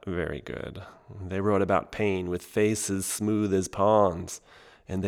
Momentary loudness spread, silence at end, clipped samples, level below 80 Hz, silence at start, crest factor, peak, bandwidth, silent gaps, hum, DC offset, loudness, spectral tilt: 17 LU; 0 s; under 0.1%; -54 dBFS; 0.05 s; 20 dB; -8 dBFS; 19 kHz; none; none; under 0.1%; -27 LUFS; -5.5 dB/octave